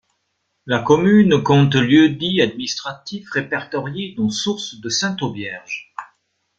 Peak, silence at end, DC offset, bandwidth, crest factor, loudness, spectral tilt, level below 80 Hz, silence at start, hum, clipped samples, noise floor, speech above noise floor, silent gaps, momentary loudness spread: -2 dBFS; 0.55 s; under 0.1%; 7.8 kHz; 18 dB; -18 LUFS; -5.5 dB/octave; -54 dBFS; 0.65 s; none; under 0.1%; -71 dBFS; 54 dB; none; 16 LU